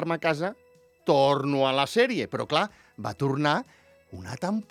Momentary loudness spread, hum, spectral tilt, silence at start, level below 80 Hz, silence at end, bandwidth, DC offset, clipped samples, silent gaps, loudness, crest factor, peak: 12 LU; none; -5.5 dB/octave; 0 s; -66 dBFS; 0.1 s; 15 kHz; under 0.1%; under 0.1%; none; -26 LUFS; 20 dB; -6 dBFS